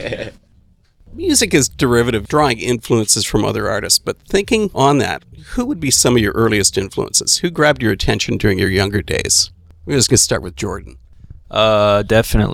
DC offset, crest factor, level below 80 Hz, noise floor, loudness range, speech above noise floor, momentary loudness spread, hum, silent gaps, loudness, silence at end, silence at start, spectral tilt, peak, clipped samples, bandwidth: under 0.1%; 16 dB; -32 dBFS; -52 dBFS; 1 LU; 36 dB; 11 LU; none; none; -15 LUFS; 0 s; 0 s; -3.5 dB/octave; 0 dBFS; under 0.1%; 19 kHz